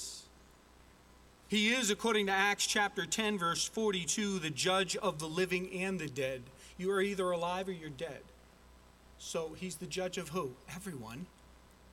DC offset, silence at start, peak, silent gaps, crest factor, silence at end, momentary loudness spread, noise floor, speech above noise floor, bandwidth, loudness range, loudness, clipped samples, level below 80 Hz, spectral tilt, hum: under 0.1%; 0 s; -16 dBFS; none; 20 dB; 0.4 s; 15 LU; -61 dBFS; 26 dB; 16.5 kHz; 10 LU; -34 LUFS; under 0.1%; -64 dBFS; -3 dB/octave; none